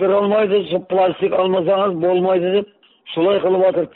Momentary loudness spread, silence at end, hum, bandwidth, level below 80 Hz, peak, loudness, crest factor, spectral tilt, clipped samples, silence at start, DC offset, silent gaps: 4 LU; 0.05 s; none; 4.2 kHz; -62 dBFS; -6 dBFS; -17 LUFS; 10 dB; -4.5 dB/octave; under 0.1%; 0 s; under 0.1%; none